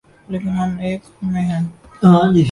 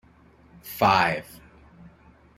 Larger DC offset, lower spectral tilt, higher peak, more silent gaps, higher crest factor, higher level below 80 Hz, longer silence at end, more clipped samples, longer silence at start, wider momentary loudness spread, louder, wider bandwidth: neither; first, -8.5 dB/octave vs -4.5 dB/octave; first, 0 dBFS vs -6 dBFS; neither; second, 16 dB vs 22 dB; first, -46 dBFS vs -56 dBFS; second, 0 s vs 1.15 s; neither; second, 0.3 s vs 0.65 s; second, 13 LU vs 26 LU; first, -17 LUFS vs -22 LUFS; second, 11 kHz vs 16.5 kHz